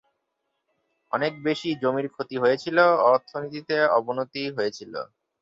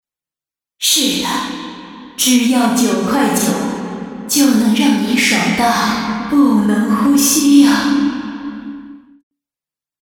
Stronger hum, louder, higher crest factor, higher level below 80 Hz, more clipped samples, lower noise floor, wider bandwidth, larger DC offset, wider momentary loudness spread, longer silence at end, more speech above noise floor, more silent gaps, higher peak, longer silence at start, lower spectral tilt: neither; second, -24 LUFS vs -13 LUFS; first, 20 dB vs 14 dB; second, -72 dBFS vs -50 dBFS; neither; second, -78 dBFS vs -90 dBFS; second, 7.6 kHz vs 19.5 kHz; neither; about the same, 14 LU vs 16 LU; second, 0.4 s vs 1.05 s; second, 55 dB vs 77 dB; neither; second, -6 dBFS vs 0 dBFS; first, 1.15 s vs 0.8 s; first, -5.5 dB/octave vs -3 dB/octave